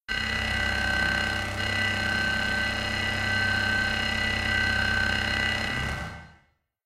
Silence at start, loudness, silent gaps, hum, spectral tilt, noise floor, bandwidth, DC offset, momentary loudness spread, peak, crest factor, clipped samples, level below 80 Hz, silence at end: 0.1 s; -25 LUFS; none; none; -3.5 dB/octave; -65 dBFS; 16 kHz; under 0.1%; 4 LU; -12 dBFS; 16 dB; under 0.1%; -40 dBFS; 0.55 s